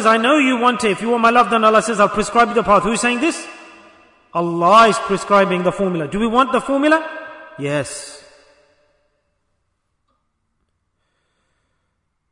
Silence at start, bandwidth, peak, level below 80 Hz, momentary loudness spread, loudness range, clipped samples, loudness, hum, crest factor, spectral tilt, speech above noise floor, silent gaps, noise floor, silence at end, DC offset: 0 s; 11 kHz; -2 dBFS; -48 dBFS; 15 LU; 15 LU; under 0.1%; -15 LUFS; none; 16 dB; -4.5 dB/octave; 55 dB; none; -70 dBFS; 4.15 s; under 0.1%